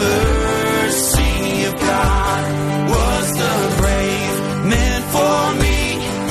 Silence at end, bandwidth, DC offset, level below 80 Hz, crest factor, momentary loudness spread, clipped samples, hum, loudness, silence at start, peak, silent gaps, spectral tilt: 0 s; 13 kHz; under 0.1%; -22 dBFS; 14 dB; 4 LU; under 0.1%; none; -17 LUFS; 0 s; -2 dBFS; none; -4.5 dB/octave